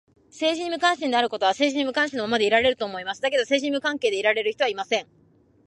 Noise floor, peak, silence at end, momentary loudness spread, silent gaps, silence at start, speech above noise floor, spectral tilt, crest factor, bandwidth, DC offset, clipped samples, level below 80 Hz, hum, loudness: -59 dBFS; -6 dBFS; 0.65 s; 6 LU; none; 0.35 s; 36 dB; -2.5 dB/octave; 18 dB; 11.5 kHz; under 0.1%; under 0.1%; -62 dBFS; none; -23 LUFS